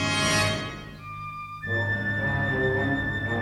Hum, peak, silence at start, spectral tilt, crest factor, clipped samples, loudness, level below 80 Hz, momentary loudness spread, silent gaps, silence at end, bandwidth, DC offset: 50 Hz at -50 dBFS; -10 dBFS; 0 s; -4 dB/octave; 16 dB; under 0.1%; -26 LUFS; -46 dBFS; 14 LU; none; 0 s; 14.5 kHz; under 0.1%